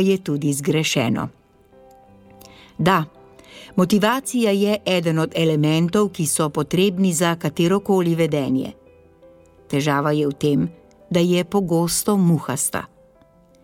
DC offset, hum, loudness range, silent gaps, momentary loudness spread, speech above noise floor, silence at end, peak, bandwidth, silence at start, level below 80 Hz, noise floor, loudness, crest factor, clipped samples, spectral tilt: under 0.1%; none; 4 LU; none; 6 LU; 34 dB; 0.75 s; -4 dBFS; 17 kHz; 0 s; -54 dBFS; -53 dBFS; -20 LUFS; 18 dB; under 0.1%; -5 dB/octave